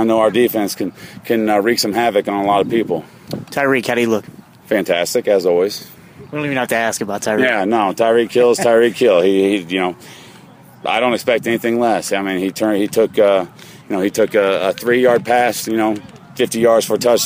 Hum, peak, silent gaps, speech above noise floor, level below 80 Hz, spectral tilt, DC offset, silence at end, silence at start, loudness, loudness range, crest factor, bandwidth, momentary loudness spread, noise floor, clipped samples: none; -2 dBFS; none; 26 dB; -60 dBFS; -4 dB/octave; under 0.1%; 0 s; 0 s; -16 LUFS; 3 LU; 12 dB; 16 kHz; 10 LU; -42 dBFS; under 0.1%